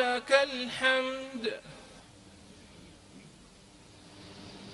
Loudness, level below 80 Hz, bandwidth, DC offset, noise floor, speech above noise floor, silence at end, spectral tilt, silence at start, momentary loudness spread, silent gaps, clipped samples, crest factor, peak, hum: -29 LUFS; -66 dBFS; 11.5 kHz; under 0.1%; -55 dBFS; 25 dB; 0 s; -2.5 dB/octave; 0 s; 27 LU; none; under 0.1%; 26 dB; -8 dBFS; none